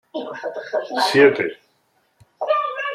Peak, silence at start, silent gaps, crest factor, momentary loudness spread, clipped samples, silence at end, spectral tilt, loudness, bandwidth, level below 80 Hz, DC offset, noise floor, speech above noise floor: -2 dBFS; 0.15 s; none; 20 dB; 16 LU; under 0.1%; 0 s; -4.5 dB/octave; -20 LUFS; 13 kHz; -70 dBFS; under 0.1%; -64 dBFS; 46 dB